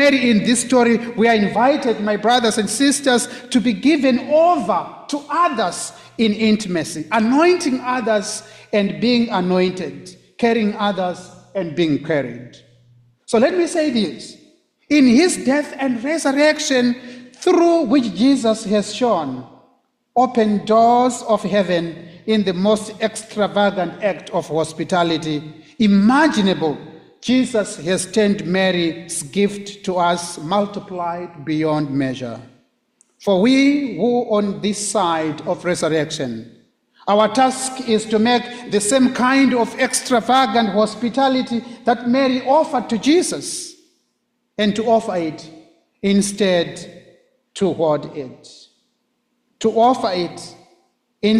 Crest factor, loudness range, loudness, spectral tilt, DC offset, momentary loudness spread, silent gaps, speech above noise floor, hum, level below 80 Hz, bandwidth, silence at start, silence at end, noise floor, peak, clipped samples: 14 dB; 5 LU; -18 LUFS; -4.5 dB/octave; under 0.1%; 12 LU; none; 53 dB; none; -58 dBFS; 14 kHz; 0 s; 0 s; -70 dBFS; -4 dBFS; under 0.1%